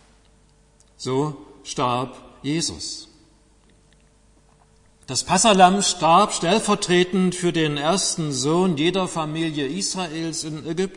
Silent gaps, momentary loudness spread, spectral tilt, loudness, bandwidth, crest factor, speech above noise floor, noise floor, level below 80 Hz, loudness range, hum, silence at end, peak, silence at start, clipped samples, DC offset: none; 13 LU; -4 dB/octave; -21 LUFS; 11 kHz; 20 dB; 35 dB; -56 dBFS; -52 dBFS; 11 LU; none; 0 s; -2 dBFS; 1 s; under 0.1%; under 0.1%